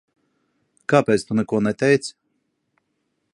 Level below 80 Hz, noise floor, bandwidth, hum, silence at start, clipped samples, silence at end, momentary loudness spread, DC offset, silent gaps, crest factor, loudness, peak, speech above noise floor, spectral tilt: -62 dBFS; -73 dBFS; 11.5 kHz; none; 0.9 s; under 0.1%; 1.25 s; 10 LU; under 0.1%; none; 22 dB; -20 LUFS; -2 dBFS; 54 dB; -6 dB/octave